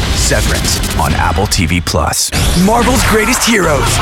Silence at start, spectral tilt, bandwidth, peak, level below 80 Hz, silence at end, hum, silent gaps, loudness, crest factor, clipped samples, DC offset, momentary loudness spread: 0 s; -3.5 dB/octave; 18 kHz; -2 dBFS; -20 dBFS; 0 s; none; none; -11 LUFS; 10 dB; under 0.1%; under 0.1%; 3 LU